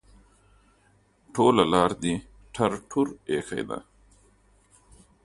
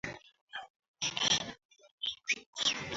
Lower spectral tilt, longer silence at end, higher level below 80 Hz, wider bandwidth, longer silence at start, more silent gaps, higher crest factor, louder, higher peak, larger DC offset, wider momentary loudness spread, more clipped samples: first, -5.5 dB/octave vs -0.5 dB/octave; first, 1.45 s vs 0 s; first, -54 dBFS vs -68 dBFS; first, 11.5 kHz vs 8 kHz; first, 1.35 s vs 0.05 s; second, none vs 0.41-0.47 s, 0.70-0.80 s, 0.88-0.94 s, 1.65-1.69 s, 1.91-1.98 s, 2.46-2.53 s; about the same, 24 dB vs 22 dB; first, -25 LUFS vs -33 LUFS; first, -4 dBFS vs -16 dBFS; neither; about the same, 15 LU vs 17 LU; neither